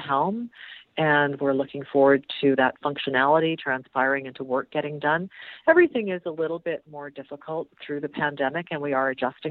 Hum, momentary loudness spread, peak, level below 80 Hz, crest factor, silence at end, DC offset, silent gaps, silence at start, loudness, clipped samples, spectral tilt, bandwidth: none; 14 LU; -4 dBFS; -70 dBFS; 20 dB; 0 s; under 0.1%; none; 0 s; -24 LUFS; under 0.1%; -9 dB/octave; 4.6 kHz